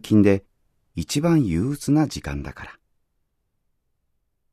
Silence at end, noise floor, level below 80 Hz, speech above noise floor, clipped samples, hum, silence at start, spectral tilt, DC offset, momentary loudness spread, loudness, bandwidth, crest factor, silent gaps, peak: 1.8 s; -72 dBFS; -44 dBFS; 52 dB; under 0.1%; none; 0.05 s; -6.5 dB/octave; under 0.1%; 19 LU; -22 LUFS; 14 kHz; 18 dB; none; -6 dBFS